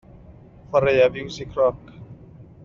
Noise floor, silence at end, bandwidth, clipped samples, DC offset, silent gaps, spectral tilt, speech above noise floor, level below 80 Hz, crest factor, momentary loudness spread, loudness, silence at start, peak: -46 dBFS; 0.2 s; 7.2 kHz; under 0.1%; under 0.1%; none; -4 dB/octave; 26 dB; -50 dBFS; 18 dB; 24 LU; -21 LUFS; 0.7 s; -6 dBFS